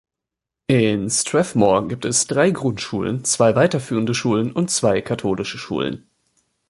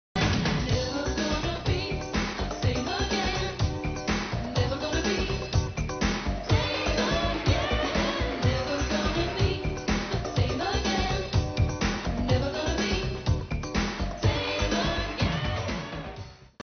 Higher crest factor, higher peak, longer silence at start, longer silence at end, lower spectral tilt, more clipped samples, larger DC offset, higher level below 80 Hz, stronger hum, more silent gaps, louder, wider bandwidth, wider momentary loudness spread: about the same, 18 dB vs 16 dB; first, -2 dBFS vs -10 dBFS; first, 0.7 s vs 0.15 s; first, 0.7 s vs 0 s; about the same, -4.5 dB/octave vs -4.5 dB/octave; neither; neither; second, -52 dBFS vs -36 dBFS; neither; neither; first, -19 LUFS vs -28 LUFS; first, 11.5 kHz vs 6.6 kHz; first, 8 LU vs 4 LU